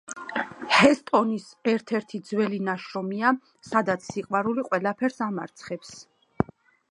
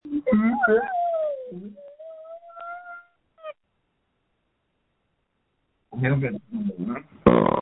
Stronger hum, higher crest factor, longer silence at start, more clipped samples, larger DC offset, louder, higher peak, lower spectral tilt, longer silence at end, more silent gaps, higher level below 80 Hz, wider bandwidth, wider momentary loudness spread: neither; about the same, 24 dB vs 26 dB; about the same, 0.1 s vs 0.05 s; neither; neither; second, -26 LUFS vs -23 LUFS; about the same, -2 dBFS vs 0 dBFS; second, -5 dB/octave vs -11 dB/octave; first, 0.45 s vs 0 s; neither; second, -60 dBFS vs -52 dBFS; first, 11 kHz vs 4 kHz; second, 12 LU vs 23 LU